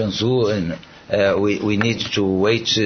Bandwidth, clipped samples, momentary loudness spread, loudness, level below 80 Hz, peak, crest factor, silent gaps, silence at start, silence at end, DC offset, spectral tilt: 6.6 kHz; under 0.1%; 7 LU; -19 LUFS; -50 dBFS; -2 dBFS; 18 dB; none; 0 s; 0 s; under 0.1%; -5 dB/octave